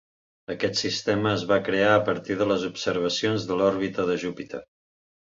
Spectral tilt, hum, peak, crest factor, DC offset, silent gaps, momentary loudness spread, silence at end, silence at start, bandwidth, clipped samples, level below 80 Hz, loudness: -4.5 dB/octave; none; -6 dBFS; 20 dB; under 0.1%; none; 14 LU; 0.75 s; 0.5 s; 7.8 kHz; under 0.1%; -58 dBFS; -24 LUFS